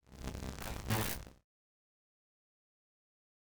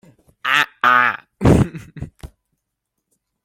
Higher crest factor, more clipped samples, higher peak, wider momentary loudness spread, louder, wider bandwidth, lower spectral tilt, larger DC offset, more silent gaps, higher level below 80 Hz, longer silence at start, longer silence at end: first, 26 dB vs 20 dB; neither; second, -18 dBFS vs 0 dBFS; second, 11 LU vs 21 LU; second, -40 LUFS vs -16 LUFS; first, over 20 kHz vs 16.5 kHz; second, -4 dB/octave vs -6 dB/octave; neither; neither; second, -52 dBFS vs -36 dBFS; second, 0 s vs 0.45 s; first, 2.05 s vs 1.2 s